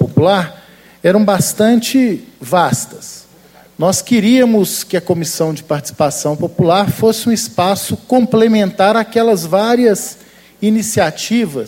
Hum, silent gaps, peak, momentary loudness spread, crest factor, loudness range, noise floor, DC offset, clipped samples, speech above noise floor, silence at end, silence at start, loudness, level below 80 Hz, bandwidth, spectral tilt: none; none; 0 dBFS; 8 LU; 14 dB; 2 LU; -44 dBFS; under 0.1%; under 0.1%; 31 dB; 0 s; 0 s; -13 LUFS; -52 dBFS; 16.5 kHz; -5 dB/octave